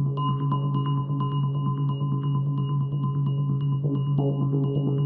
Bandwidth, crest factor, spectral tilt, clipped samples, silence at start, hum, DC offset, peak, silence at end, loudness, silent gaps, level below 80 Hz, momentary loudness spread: 3.1 kHz; 12 dB; -9.5 dB/octave; under 0.1%; 0 s; none; under 0.1%; -12 dBFS; 0 s; -26 LUFS; none; -60 dBFS; 2 LU